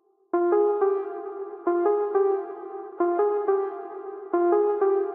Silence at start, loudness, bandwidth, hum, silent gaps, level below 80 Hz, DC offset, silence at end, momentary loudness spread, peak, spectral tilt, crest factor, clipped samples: 0.35 s; -25 LUFS; 2.9 kHz; none; none; under -90 dBFS; under 0.1%; 0 s; 14 LU; -10 dBFS; -9 dB/octave; 16 dB; under 0.1%